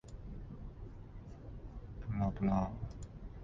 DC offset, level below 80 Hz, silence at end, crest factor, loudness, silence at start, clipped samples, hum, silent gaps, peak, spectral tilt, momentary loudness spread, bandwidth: under 0.1%; -48 dBFS; 0 s; 18 dB; -40 LUFS; 0.05 s; under 0.1%; none; none; -22 dBFS; -9 dB/octave; 18 LU; 7.6 kHz